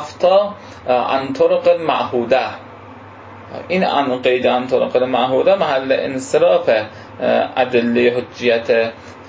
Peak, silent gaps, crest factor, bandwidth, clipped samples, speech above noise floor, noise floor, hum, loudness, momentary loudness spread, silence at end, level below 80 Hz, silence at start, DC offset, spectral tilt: -2 dBFS; none; 14 dB; 8 kHz; under 0.1%; 21 dB; -37 dBFS; none; -16 LUFS; 9 LU; 0 s; -54 dBFS; 0 s; under 0.1%; -5.5 dB/octave